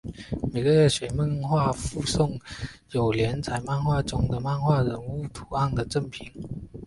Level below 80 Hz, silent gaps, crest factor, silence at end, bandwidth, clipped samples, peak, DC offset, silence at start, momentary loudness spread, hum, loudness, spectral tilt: -42 dBFS; none; 16 dB; 0 s; 11.5 kHz; under 0.1%; -10 dBFS; under 0.1%; 0.05 s; 14 LU; none; -26 LUFS; -6 dB/octave